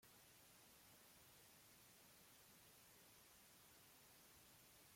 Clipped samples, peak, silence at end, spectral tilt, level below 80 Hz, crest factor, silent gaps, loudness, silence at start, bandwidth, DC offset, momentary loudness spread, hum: under 0.1%; -56 dBFS; 0 s; -2 dB/octave; -88 dBFS; 14 dB; none; -67 LUFS; 0 s; 16.5 kHz; under 0.1%; 0 LU; none